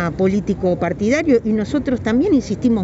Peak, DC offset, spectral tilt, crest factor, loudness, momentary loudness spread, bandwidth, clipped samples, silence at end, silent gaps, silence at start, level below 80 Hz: -4 dBFS; under 0.1%; -7 dB/octave; 12 dB; -18 LUFS; 4 LU; 8 kHz; under 0.1%; 0 s; none; 0 s; -40 dBFS